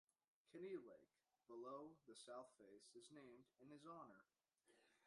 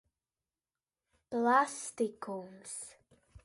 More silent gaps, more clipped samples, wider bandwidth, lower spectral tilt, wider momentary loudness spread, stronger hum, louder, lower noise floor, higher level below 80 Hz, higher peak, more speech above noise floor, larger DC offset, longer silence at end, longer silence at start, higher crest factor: neither; neither; about the same, 11 kHz vs 11.5 kHz; about the same, -4.5 dB/octave vs -3.5 dB/octave; second, 11 LU vs 16 LU; neither; second, -61 LUFS vs -34 LUFS; second, -82 dBFS vs under -90 dBFS; second, under -90 dBFS vs -72 dBFS; second, -42 dBFS vs -14 dBFS; second, 20 dB vs over 56 dB; neither; about the same, 0 s vs 0.05 s; second, 0.45 s vs 1.3 s; about the same, 20 dB vs 22 dB